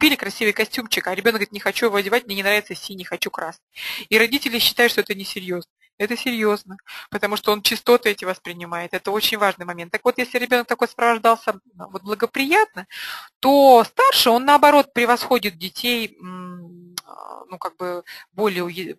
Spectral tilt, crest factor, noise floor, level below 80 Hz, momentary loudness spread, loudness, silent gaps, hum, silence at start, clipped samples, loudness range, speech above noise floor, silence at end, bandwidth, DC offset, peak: -3 dB/octave; 20 dB; -39 dBFS; -62 dBFS; 18 LU; -19 LUFS; 3.63-3.67 s, 5.70-5.76 s, 5.93-5.98 s, 13.36-13.41 s; none; 0 s; under 0.1%; 6 LU; 19 dB; 0.05 s; 13 kHz; under 0.1%; 0 dBFS